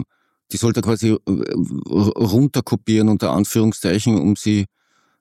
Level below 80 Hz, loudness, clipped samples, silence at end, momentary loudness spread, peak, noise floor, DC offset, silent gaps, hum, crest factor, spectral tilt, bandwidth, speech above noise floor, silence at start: -52 dBFS; -18 LUFS; under 0.1%; 0.55 s; 5 LU; -4 dBFS; -39 dBFS; under 0.1%; none; none; 14 dB; -6.5 dB/octave; 16 kHz; 22 dB; 0 s